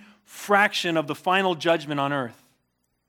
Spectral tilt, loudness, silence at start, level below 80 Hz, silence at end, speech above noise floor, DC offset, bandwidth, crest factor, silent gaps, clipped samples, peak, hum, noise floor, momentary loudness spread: -4.5 dB/octave; -23 LUFS; 0.3 s; -80 dBFS; 0.75 s; 50 dB; under 0.1%; 18.5 kHz; 22 dB; none; under 0.1%; -4 dBFS; none; -74 dBFS; 10 LU